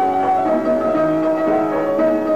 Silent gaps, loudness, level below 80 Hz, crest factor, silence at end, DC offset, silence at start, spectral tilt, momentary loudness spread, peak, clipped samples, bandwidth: none; -17 LUFS; -52 dBFS; 8 dB; 0 s; 0.6%; 0 s; -7.5 dB/octave; 1 LU; -8 dBFS; under 0.1%; 14.5 kHz